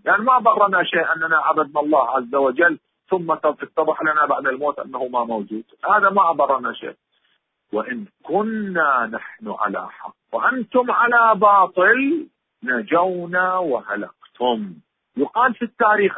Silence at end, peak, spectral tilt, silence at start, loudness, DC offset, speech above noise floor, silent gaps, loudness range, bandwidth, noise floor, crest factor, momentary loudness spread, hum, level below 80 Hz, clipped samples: 0 s; -2 dBFS; -10 dB/octave; 0.05 s; -19 LUFS; under 0.1%; 48 dB; none; 6 LU; 4 kHz; -67 dBFS; 16 dB; 14 LU; none; -66 dBFS; under 0.1%